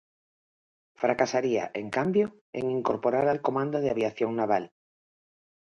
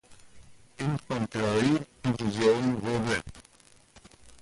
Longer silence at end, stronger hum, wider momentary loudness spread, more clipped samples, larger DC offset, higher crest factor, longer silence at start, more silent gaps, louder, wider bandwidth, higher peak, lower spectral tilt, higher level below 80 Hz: first, 1 s vs 0.05 s; neither; second, 5 LU vs 8 LU; neither; neither; about the same, 20 dB vs 16 dB; first, 1 s vs 0.1 s; first, 2.41-2.53 s vs none; about the same, -28 LUFS vs -28 LUFS; second, 8 kHz vs 11.5 kHz; first, -8 dBFS vs -12 dBFS; about the same, -6 dB/octave vs -6 dB/octave; second, -68 dBFS vs -56 dBFS